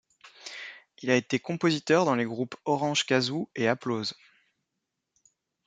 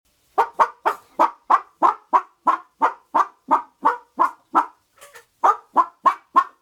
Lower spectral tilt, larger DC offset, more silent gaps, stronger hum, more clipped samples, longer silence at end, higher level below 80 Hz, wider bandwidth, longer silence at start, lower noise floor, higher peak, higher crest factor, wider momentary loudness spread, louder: about the same, -4.5 dB/octave vs -3.5 dB/octave; neither; neither; neither; neither; first, 1.55 s vs 0.15 s; about the same, -74 dBFS vs -74 dBFS; second, 9.4 kHz vs 15 kHz; about the same, 0.25 s vs 0.35 s; first, -84 dBFS vs -48 dBFS; second, -8 dBFS vs -2 dBFS; about the same, 22 dB vs 18 dB; first, 16 LU vs 5 LU; second, -27 LUFS vs -21 LUFS